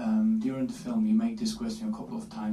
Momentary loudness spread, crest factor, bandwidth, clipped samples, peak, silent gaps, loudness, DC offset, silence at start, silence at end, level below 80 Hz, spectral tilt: 9 LU; 12 dB; 12 kHz; under 0.1%; -18 dBFS; none; -30 LUFS; under 0.1%; 0 s; 0 s; -58 dBFS; -6 dB/octave